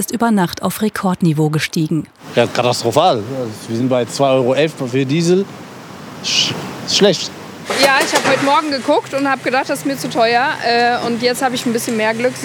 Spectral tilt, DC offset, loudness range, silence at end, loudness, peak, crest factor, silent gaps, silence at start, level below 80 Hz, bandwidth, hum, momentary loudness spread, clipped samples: -4 dB/octave; under 0.1%; 2 LU; 0 s; -16 LUFS; 0 dBFS; 16 dB; none; 0 s; -60 dBFS; over 20 kHz; none; 9 LU; under 0.1%